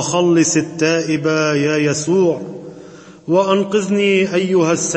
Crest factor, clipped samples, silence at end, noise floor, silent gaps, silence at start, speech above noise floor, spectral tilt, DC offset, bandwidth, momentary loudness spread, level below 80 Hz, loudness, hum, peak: 14 dB; under 0.1%; 0 s; -38 dBFS; none; 0 s; 23 dB; -4.5 dB/octave; under 0.1%; 8.8 kHz; 9 LU; -60 dBFS; -16 LUFS; none; -2 dBFS